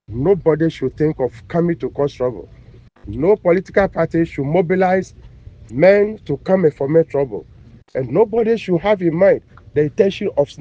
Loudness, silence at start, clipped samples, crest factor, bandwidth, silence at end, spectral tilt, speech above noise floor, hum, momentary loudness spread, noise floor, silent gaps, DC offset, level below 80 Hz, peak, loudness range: -17 LUFS; 0.1 s; under 0.1%; 18 dB; 7.8 kHz; 0.05 s; -8.5 dB/octave; 26 dB; none; 9 LU; -42 dBFS; none; under 0.1%; -44 dBFS; 0 dBFS; 3 LU